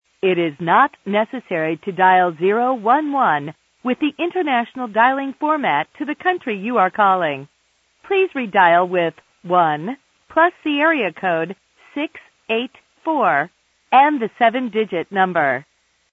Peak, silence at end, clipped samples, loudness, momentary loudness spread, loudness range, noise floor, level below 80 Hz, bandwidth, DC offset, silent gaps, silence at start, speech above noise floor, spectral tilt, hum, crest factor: 0 dBFS; 0.5 s; under 0.1%; -18 LUFS; 12 LU; 3 LU; -63 dBFS; -70 dBFS; 7.6 kHz; under 0.1%; none; 0.25 s; 45 dB; -7 dB/octave; none; 18 dB